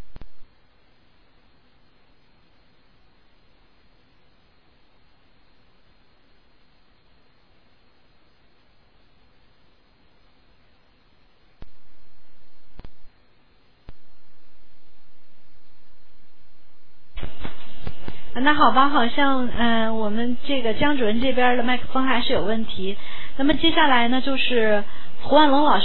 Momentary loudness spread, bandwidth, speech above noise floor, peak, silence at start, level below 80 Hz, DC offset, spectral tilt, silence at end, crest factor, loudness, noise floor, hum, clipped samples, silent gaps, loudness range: 22 LU; 5 kHz; 43 dB; -2 dBFS; 0 s; -44 dBFS; under 0.1%; -8 dB/octave; 0 s; 18 dB; -20 LUFS; -60 dBFS; none; under 0.1%; none; 22 LU